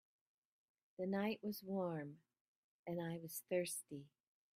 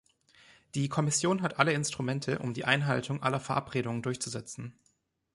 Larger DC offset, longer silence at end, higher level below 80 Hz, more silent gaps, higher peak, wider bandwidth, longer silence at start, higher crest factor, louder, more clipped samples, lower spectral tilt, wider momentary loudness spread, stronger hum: neither; second, 0.5 s vs 0.65 s; second, -86 dBFS vs -66 dBFS; first, 2.41-2.85 s vs none; second, -28 dBFS vs -8 dBFS; first, 16 kHz vs 11.5 kHz; first, 1 s vs 0.75 s; about the same, 20 dB vs 24 dB; second, -44 LUFS vs -31 LUFS; neither; about the same, -5 dB/octave vs -4.5 dB/octave; first, 14 LU vs 11 LU; neither